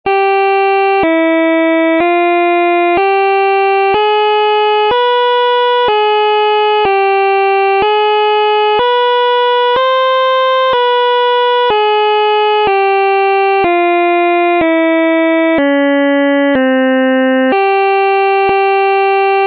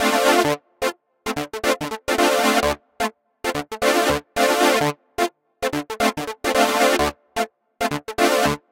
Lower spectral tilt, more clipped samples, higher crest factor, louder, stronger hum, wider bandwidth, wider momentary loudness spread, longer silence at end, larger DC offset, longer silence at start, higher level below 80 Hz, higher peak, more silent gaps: first, -6 dB/octave vs -3 dB/octave; neither; second, 6 dB vs 20 dB; first, -10 LUFS vs -21 LUFS; neither; second, 5.6 kHz vs 17 kHz; second, 0 LU vs 10 LU; second, 0 s vs 0.15 s; neither; about the same, 0.05 s vs 0 s; second, -52 dBFS vs -46 dBFS; about the same, -4 dBFS vs -2 dBFS; neither